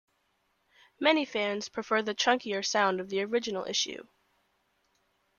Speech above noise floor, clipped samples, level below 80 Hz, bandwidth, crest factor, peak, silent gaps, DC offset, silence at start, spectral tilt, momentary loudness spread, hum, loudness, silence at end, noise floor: 45 dB; under 0.1%; -76 dBFS; 10 kHz; 22 dB; -10 dBFS; none; under 0.1%; 1 s; -2.5 dB/octave; 6 LU; none; -29 LUFS; 1.35 s; -74 dBFS